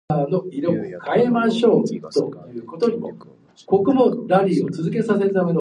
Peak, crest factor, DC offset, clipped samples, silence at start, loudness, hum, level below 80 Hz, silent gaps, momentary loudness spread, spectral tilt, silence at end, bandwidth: -2 dBFS; 18 dB; under 0.1%; under 0.1%; 0.1 s; -20 LUFS; none; -60 dBFS; none; 9 LU; -7.5 dB/octave; 0 s; 10.5 kHz